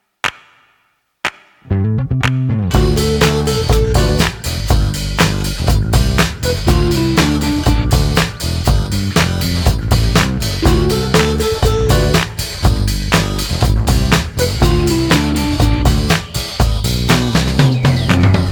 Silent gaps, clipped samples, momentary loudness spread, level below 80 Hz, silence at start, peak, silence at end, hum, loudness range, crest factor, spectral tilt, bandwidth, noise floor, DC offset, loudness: none; under 0.1%; 5 LU; -20 dBFS; 0.25 s; 0 dBFS; 0 s; none; 1 LU; 14 dB; -5 dB/octave; 19.5 kHz; -61 dBFS; under 0.1%; -15 LUFS